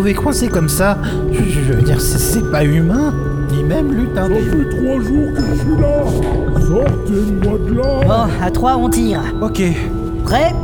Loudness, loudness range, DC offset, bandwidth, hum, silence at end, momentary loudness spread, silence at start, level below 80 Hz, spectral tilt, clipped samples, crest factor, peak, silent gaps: -15 LUFS; 1 LU; under 0.1%; over 20 kHz; none; 0 s; 3 LU; 0 s; -22 dBFS; -6 dB/octave; under 0.1%; 14 dB; 0 dBFS; none